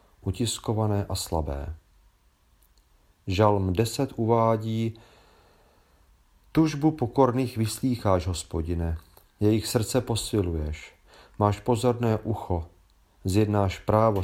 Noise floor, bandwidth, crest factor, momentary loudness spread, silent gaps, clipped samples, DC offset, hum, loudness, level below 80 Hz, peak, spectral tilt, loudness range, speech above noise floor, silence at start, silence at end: -63 dBFS; 16.5 kHz; 22 dB; 11 LU; none; under 0.1%; under 0.1%; none; -26 LUFS; -44 dBFS; -6 dBFS; -6 dB/octave; 3 LU; 38 dB; 0.25 s; 0 s